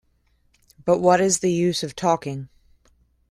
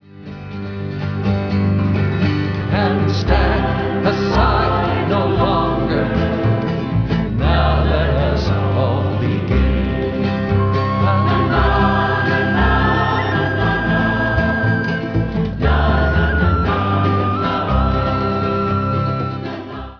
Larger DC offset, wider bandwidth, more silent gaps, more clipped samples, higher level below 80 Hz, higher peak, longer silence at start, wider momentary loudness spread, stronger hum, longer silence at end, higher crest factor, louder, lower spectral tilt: second, under 0.1% vs 0.3%; first, 14 kHz vs 5.4 kHz; neither; neither; second, -58 dBFS vs -24 dBFS; about the same, -4 dBFS vs -2 dBFS; first, 0.85 s vs 0.15 s; first, 14 LU vs 5 LU; neither; first, 0.85 s vs 0 s; first, 20 dB vs 14 dB; second, -21 LUFS vs -17 LUFS; second, -4.5 dB/octave vs -8 dB/octave